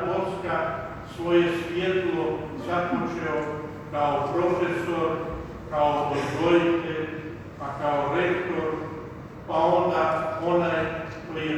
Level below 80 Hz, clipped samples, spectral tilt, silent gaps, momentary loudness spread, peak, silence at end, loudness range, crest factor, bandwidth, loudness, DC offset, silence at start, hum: -50 dBFS; under 0.1%; -7 dB/octave; none; 12 LU; -8 dBFS; 0 s; 2 LU; 18 dB; 11 kHz; -26 LUFS; under 0.1%; 0 s; none